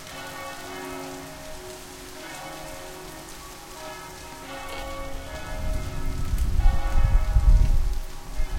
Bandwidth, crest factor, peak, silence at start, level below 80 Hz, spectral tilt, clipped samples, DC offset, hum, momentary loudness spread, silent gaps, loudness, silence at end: 16 kHz; 18 dB; -6 dBFS; 0 s; -26 dBFS; -5 dB/octave; under 0.1%; under 0.1%; none; 15 LU; none; -31 LUFS; 0 s